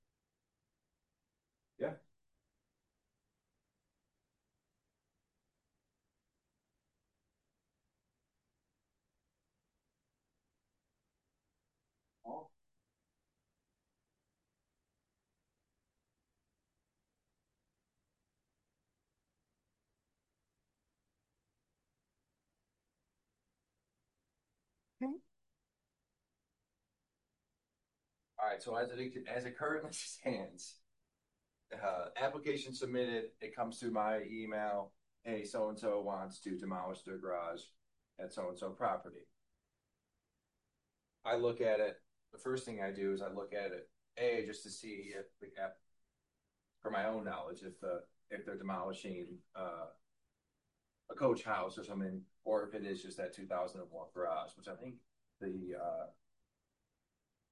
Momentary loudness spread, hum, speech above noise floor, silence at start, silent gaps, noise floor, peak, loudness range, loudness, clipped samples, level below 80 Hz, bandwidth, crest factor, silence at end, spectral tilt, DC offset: 14 LU; none; over 49 dB; 1.8 s; none; under -90 dBFS; -22 dBFS; 13 LU; -42 LUFS; under 0.1%; -82 dBFS; 11.5 kHz; 24 dB; 1.4 s; -5 dB/octave; under 0.1%